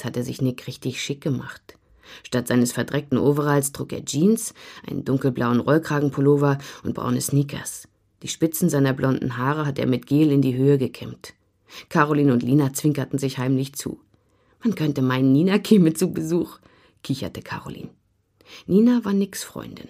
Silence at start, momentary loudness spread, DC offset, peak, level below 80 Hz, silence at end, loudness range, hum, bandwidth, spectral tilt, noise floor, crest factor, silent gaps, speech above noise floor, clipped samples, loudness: 0 s; 15 LU; under 0.1%; -2 dBFS; -58 dBFS; 0.05 s; 3 LU; none; 15.5 kHz; -6 dB/octave; -62 dBFS; 20 dB; none; 40 dB; under 0.1%; -22 LUFS